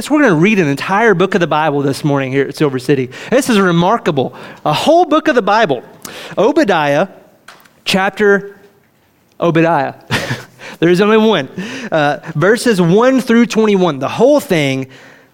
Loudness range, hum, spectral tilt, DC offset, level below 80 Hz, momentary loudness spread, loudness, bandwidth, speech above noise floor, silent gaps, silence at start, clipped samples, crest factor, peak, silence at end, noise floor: 3 LU; none; -5.5 dB/octave; under 0.1%; -52 dBFS; 11 LU; -13 LUFS; 17 kHz; 41 dB; none; 0 s; under 0.1%; 12 dB; 0 dBFS; 0.4 s; -53 dBFS